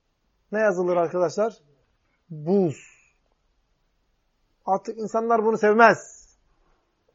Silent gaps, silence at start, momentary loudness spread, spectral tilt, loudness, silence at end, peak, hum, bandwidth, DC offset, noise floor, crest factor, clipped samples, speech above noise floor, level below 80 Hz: none; 0.5 s; 16 LU; -6 dB/octave; -22 LUFS; 1.1 s; -2 dBFS; none; 8 kHz; under 0.1%; -70 dBFS; 22 dB; under 0.1%; 48 dB; -70 dBFS